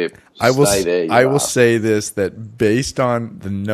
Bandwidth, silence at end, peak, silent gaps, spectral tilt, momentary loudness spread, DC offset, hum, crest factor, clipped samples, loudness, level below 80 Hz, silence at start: 13.5 kHz; 0 s; 0 dBFS; none; -4.5 dB/octave; 9 LU; under 0.1%; none; 16 dB; under 0.1%; -17 LUFS; -46 dBFS; 0 s